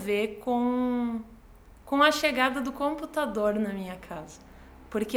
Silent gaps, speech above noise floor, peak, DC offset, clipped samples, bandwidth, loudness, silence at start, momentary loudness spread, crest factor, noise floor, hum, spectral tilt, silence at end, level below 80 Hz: none; 24 dB; -8 dBFS; under 0.1%; under 0.1%; 17.5 kHz; -27 LUFS; 0 s; 16 LU; 20 dB; -52 dBFS; none; -4.5 dB/octave; 0 s; -54 dBFS